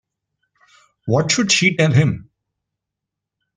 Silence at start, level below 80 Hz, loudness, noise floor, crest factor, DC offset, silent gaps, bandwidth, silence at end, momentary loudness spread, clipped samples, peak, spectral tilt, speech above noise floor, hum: 1.05 s; -56 dBFS; -16 LUFS; -83 dBFS; 18 dB; under 0.1%; none; 9.8 kHz; 1.35 s; 13 LU; under 0.1%; -2 dBFS; -4.5 dB/octave; 67 dB; none